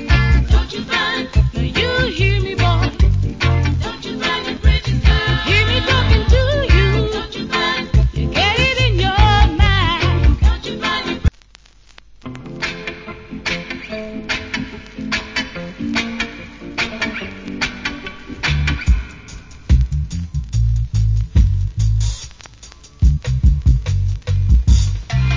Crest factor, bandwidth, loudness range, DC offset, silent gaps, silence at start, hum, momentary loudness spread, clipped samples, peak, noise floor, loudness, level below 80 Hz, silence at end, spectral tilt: 16 dB; 7.6 kHz; 9 LU; under 0.1%; none; 0 s; none; 13 LU; under 0.1%; 0 dBFS; -46 dBFS; -17 LUFS; -20 dBFS; 0 s; -5.5 dB/octave